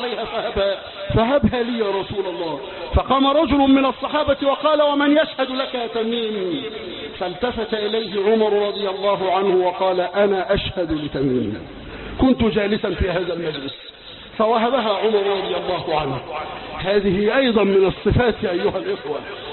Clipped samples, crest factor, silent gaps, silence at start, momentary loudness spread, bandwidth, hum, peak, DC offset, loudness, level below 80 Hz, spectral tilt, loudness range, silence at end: under 0.1%; 16 dB; none; 0 s; 12 LU; 4.3 kHz; none; -4 dBFS; under 0.1%; -20 LUFS; -38 dBFS; -11 dB/octave; 4 LU; 0 s